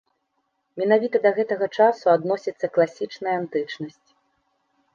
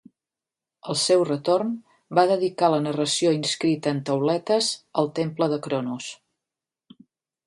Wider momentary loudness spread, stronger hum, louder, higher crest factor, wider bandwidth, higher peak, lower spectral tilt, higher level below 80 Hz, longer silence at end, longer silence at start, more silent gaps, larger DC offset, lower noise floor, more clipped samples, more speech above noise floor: first, 12 LU vs 9 LU; neither; about the same, -22 LUFS vs -23 LUFS; about the same, 18 dB vs 20 dB; second, 7.2 kHz vs 11.5 kHz; about the same, -4 dBFS vs -4 dBFS; first, -6.5 dB/octave vs -4.5 dB/octave; about the same, -76 dBFS vs -72 dBFS; second, 1.05 s vs 1.3 s; about the same, 0.75 s vs 0.85 s; neither; neither; second, -74 dBFS vs -89 dBFS; neither; second, 52 dB vs 66 dB